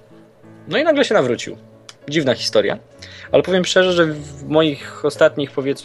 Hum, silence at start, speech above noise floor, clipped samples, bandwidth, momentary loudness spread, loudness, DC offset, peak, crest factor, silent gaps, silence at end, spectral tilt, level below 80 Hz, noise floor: none; 0.65 s; 28 dB; under 0.1%; 12.5 kHz; 15 LU; -17 LUFS; under 0.1%; -2 dBFS; 16 dB; none; 0 s; -4.5 dB/octave; -54 dBFS; -45 dBFS